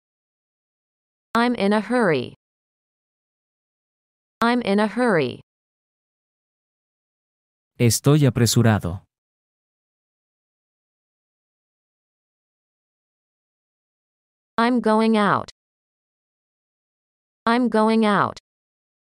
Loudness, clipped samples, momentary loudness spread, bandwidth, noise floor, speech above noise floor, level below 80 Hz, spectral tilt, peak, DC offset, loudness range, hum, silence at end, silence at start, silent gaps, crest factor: -20 LUFS; under 0.1%; 9 LU; 16 kHz; under -90 dBFS; over 71 dB; -58 dBFS; -5.5 dB/octave; -4 dBFS; under 0.1%; 4 LU; none; 0.85 s; 1.35 s; 2.36-4.41 s, 5.43-7.71 s, 9.18-14.57 s, 15.51-17.46 s; 20 dB